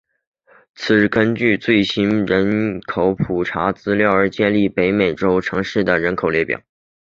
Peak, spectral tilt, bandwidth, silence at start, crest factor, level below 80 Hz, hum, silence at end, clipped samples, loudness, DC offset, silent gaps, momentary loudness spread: 0 dBFS; -7 dB/octave; 7.4 kHz; 0.8 s; 16 dB; -46 dBFS; none; 0.55 s; under 0.1%; -17 LUFS; under 0.1%; none; 5 LU